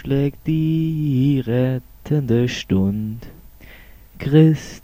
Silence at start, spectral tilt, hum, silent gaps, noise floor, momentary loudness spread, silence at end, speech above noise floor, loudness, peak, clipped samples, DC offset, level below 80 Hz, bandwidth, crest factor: 0.05 s; -8 dB/octave; none; none; -43 dBFS; 13 LU; 0.05 s; 25 dB; -19 LUFS; -2 dBFS; under 0.1%; under 0.1%; -42 dBFS; 15.5 kHz; 16 dB